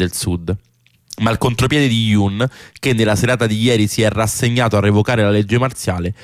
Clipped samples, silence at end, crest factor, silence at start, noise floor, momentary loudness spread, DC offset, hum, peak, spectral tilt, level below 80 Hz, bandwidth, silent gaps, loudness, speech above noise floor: under 0.1%; 0.1 s; 12 dB; 0 s; -41 dBFS; 7 LU; under 0.1%; none; -4 dBFS; -5.5 dB/octave; -40 dBFS; 15.5 kHz; none; -16 LUFS; 25 dB